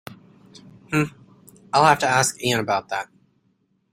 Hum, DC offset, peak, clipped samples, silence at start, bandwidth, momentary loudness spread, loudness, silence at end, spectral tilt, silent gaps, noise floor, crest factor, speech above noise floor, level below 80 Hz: none; under 0.1%; -2 dBFS; under 0.1%; 0.1 s; 16 kHz; 13 LU; -21 LUFS; 0.9 s; -3.5 dB/octave; none; -67 dBFS; 22 dB; 47 dB; -58 dBFS